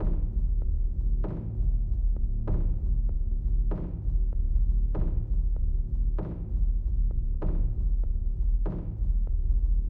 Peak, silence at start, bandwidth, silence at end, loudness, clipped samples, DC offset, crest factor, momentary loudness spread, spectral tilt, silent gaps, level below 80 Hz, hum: -14 dBFS; 0 s; 1.7 kHz; 0 s; -31 LUFS; under 0.1%; under 0.1%; 10 dB; 3 LU; -12.5 dB/octave; none; -26 dBFS; none